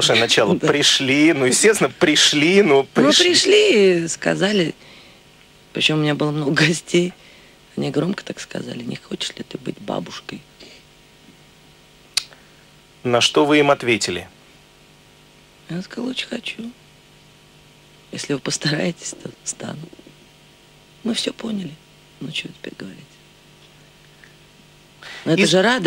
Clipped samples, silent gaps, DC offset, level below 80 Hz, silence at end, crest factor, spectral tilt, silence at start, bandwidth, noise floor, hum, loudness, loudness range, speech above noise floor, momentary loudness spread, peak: under 0.1%; none; under 0.1%; -60 dBFS; 0 s; 18 dB; -3.5 dB/octave; 0 s; 16 kHz; -49 dBFS; none; -18 LUFS; 17 LU; 31 dB; 20 LU; -2 dBFS